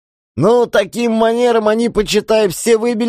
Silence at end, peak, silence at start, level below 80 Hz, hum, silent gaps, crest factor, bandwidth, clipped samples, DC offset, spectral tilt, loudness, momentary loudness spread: 0 s; -2 dBFS; 0.35 s; -42 dBFS; none; none; 12 dB; 15.5 kHz; under 0.1%; under 0.1%; -4.5 dB/octave; -14 LUFS; 4 LU